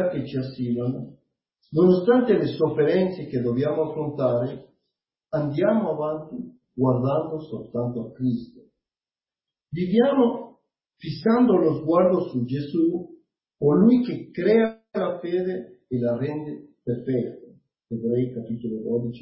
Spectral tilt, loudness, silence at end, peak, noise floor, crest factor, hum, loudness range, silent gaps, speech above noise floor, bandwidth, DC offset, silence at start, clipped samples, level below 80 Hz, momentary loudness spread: -12.5 dB/octave; -24 LUFS; 0 s; -6 dBFS; under -90 dBFS; 18 dB; none; 6 LU; none; over 67 dB; 5.8 kHz; under 0.1%; 0 s; under 0.1%; -60 dBFS; 15 LU